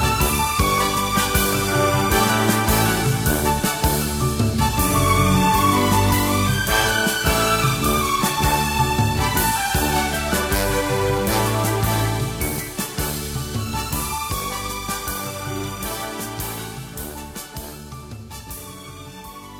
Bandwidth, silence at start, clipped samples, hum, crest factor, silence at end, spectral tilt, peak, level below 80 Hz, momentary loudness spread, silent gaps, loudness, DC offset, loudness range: 19 kHz; 0 s; under 0.1%; none; 16 dB; 0 s; -4 dB/octave; -4 dBFS; -32 dBFS; 15 LU; none; -20 LUFS; under 0.1%; 11 LU